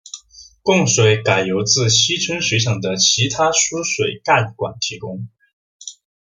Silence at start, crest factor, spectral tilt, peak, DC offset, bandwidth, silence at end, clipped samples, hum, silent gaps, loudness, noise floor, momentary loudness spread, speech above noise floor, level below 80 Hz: 0.15 s; 18 dB; -3 dB/octave; -2 dBFS; under 0.1%; 10 kHz; 0.35 s; under 0.1%; none; 5.53-5.80 s; -16 LUFS; -45 dBFS; 21 LU; 28 dB; -54 dBFS